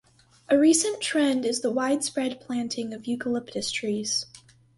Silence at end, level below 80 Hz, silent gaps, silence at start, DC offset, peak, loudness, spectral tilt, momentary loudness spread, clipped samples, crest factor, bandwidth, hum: 0.4 s; -66 dBFS; none; 0.5 s; under 0.1%; -8 dBFS; -25 LUFS; -2.5 dB/octave; 11 LU; under 0.1%; 18 dB; 11.5 kHz; none